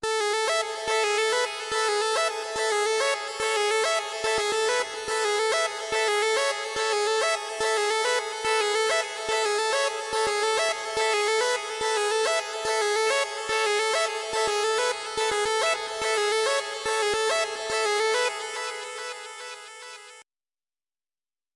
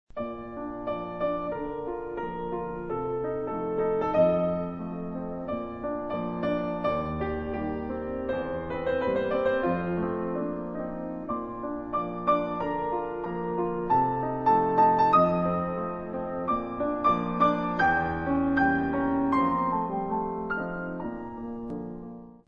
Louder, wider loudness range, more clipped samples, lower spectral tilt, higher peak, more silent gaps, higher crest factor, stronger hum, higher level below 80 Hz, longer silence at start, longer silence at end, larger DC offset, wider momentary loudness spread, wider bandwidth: first, -25 LUFS vs -28 LUFS; second, 2 LU vs 6 LU; neither; second, 0.5 dB/octave vs -9 dB/octave; about the same, -10 dBFS vs -10 dBFS; neither; about the same, 16 dB vs 18 dB; neither; second, -64 dBFS vs -50 dBFS; second, 0 s vs 0.15 s; first, 1.35 s vs 0.15 s; neither; second, 4 LU vs 11 LU; first, 11.5 kHz vs 6.4 kHz